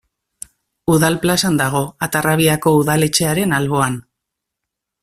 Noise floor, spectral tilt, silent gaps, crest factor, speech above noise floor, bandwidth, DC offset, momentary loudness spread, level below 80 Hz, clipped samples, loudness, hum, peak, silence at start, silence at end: -81 dBFS; -4.5 dB/octave; none; 16 dB; 65 dB; 16 kHz; under 0.1%; 16 LU; -48 dBFS; under 0.1%; -16 LUFS; none; 0 dBFS; 0.85 s; 1 s